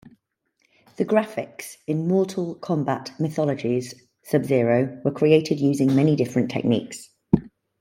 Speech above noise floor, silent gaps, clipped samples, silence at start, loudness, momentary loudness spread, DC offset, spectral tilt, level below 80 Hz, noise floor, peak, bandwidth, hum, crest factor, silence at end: 49 dB; none; under 0.1%; 1 s; -23 LUFS; 11 LU; under 0.1%; -7 dB/octave; -56 dBFS; -71 dBFS; -2 dBFS; 16.5 kHz; none; 20 dB; 0.35 s